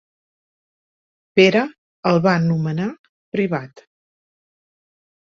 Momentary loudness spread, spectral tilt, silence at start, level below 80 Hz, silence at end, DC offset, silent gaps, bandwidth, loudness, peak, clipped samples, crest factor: 13 LU; -7 dB/octave; 1.35 s; -62 dBFS; 1.65 s; under 0.1%; 1.78-2.03 s, 2.99-3.32 s; 7.2 kHz; -19 LUFS; -2 dBFS; under 0.1%; 20 dB